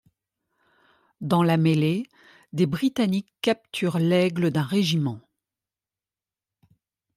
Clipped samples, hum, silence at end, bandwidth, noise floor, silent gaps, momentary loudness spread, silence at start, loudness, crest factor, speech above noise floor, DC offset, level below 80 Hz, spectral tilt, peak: under 0.1%; none; 1.95 s; 14.5 kHz; under -90 dBFS; none; 10 LU; 1.2 s; -24 LUFS; 18 dB; over 67 dB; under 0.1%; -66 dBFS; -6.5 dB/octave; -8 dBFS